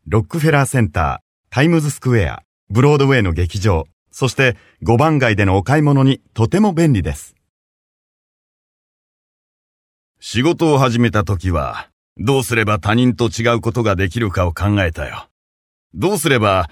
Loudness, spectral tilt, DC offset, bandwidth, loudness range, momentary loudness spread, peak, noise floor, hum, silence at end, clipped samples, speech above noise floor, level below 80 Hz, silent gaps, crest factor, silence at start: -16 LUFS; -6 dB/octave; under 0.1%; 15 kHz; 5 LU; 10 LU; 0 dBFS; under -90 dBFS; none; 0.05 s; under 0.1%; over 75 dB; -36 dBFS; 1.22-1.44 s, 2.45-2.67 s, 3.93-4.06 s, 7.49-10.15 s, 11.93-12.16 s, 15.31-15.90 s; 16 dB; 0.05 s